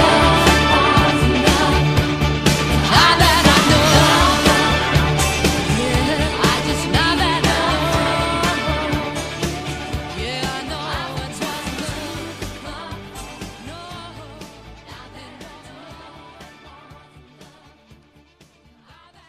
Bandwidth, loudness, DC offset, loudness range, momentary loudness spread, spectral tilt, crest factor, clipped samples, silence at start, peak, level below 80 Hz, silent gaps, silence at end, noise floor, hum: 15.5 kHz; -16 LUFS; under 0.1%; 21 LU; 21 LU; -4 dB/octave; 18 dB; under 0.1%; 0 s; 0 dBFS; -30 dBFS; none; 2.35 s; -52 dBFS; none